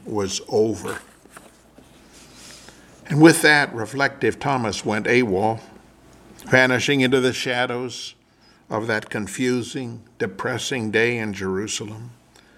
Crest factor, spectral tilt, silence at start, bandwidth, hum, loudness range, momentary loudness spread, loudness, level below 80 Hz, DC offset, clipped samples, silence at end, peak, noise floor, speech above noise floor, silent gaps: 22 dB; -4.5 dB/octave; 0.05 s; 15.5 kHz; none; 7 LU; 17 LU; -21 LUFS; -58 dBFS; under 0.1%; under 0.1%; 0.45 s; 0 dBFS; -55 dBFS; 34 dB; none